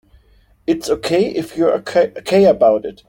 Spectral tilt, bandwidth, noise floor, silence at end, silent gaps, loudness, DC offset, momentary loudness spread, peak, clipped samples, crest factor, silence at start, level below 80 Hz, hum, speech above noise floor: -5.5 dB/octave; 17 kHz; -52 dBFS; 0.15 s; none; -16 LUFS; under 0.1%; 9 LU; -2 dBFS; under 0.1%; 14 dB; 0.7 s; -50 dBFS; none; 37 dB